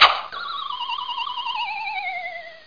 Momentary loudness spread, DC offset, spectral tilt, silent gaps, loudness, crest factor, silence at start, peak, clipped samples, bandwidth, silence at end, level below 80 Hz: 4 LU; 0.3%; -0.5 dB/octave; none; -25 LUFS; 24 dB; 0 s; 0 dBFS; under 0.1%; 5.4 kHz; 0 s; -60 dBFS